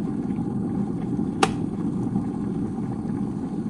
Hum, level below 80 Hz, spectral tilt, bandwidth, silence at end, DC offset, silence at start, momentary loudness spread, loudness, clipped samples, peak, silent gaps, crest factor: none; -48 dBFS; -6.5 dB/octave; 11.5 kHz; 0 s; under 0.1%; 0 s; 5 LU; -27 LUFS; under 0.1%; -2 dBFS; none; 24 dB